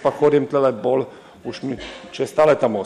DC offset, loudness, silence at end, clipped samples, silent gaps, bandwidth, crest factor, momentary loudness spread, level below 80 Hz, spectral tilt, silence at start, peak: under 0.1%; -19 LUFS; 0 s; under 0.1%; none; 12 kHz; 14 dB; 17 LU; -56 dBFS; -6.5 dB/octave; 0 s; -6 dBFS